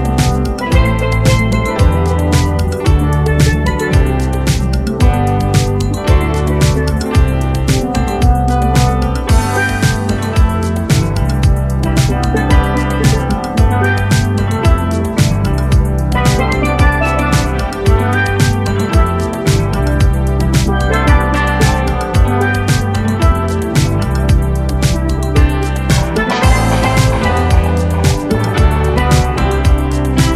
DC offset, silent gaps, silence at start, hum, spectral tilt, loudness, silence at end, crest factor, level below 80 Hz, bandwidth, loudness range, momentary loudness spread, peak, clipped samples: under 0.1%; none; 0 s; none; -6 dB/octave; -13 LUFS; 0 s; 12 dB; -16 dBFS; 15 kHz; 1 LU; 3 LU; 0 dBFS; under 0.1%